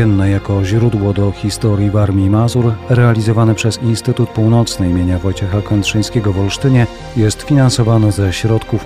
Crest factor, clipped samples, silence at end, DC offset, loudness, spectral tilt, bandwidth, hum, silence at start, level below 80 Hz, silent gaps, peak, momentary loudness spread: 10 dB; under 0.1%; 0 s; 0.3%; -14 LUFS; -6.5 dB/octave; 13.5 kHz; none; 0 s; -34 dBFS; none; -2 dBFS; 4 LU